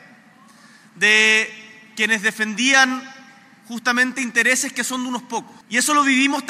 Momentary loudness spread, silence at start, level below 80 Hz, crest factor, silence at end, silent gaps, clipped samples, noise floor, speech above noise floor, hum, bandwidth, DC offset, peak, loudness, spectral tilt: 14 LU; 0.95 s; -80 dBFS; 20 dB; 0 s; none; under 0.1%; -49 dBFS; 30 dB; none; 16 kHz; under 0.1%; 0 dBFS; -17 LUFS; -1 dB/octave